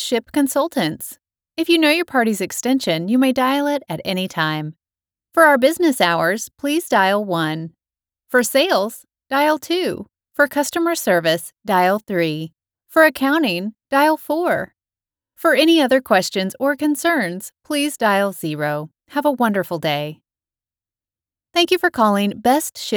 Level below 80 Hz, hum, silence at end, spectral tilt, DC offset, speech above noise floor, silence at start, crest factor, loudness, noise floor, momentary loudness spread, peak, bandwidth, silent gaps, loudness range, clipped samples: -64 dBFS; none; 0 s; -4 dB/octave; under 0.1%; over 72 dB; 0 s; 18 dB; -18 LUFS; under -90 dBFS; 10 LU; -2 dBFS; over 20 kHz; none; 3 LU; under 0.1%